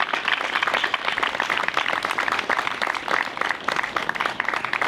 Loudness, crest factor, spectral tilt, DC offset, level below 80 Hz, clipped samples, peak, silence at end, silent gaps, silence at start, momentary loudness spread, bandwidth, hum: -23 LUFS; 18 dB; -1.5 dB/octave; under 0.1%; -60 dBFS; under 0.1%; -6 dBFS; 0 s; none; 0 s; 3 LU; 17.5 kHz; none